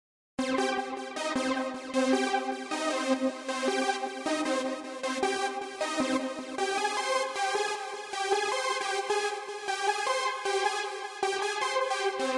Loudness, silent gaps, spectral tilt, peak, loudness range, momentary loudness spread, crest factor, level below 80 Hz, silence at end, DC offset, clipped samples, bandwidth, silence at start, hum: -30 LUFS; none; -1.5 dB/octave; -14 dBFS; 1 LU; 6 LU; 16 dB; -74 dBFS; 0 s; under 0.1%; under 0.1%; 11.5 kHz; 0.4 s; none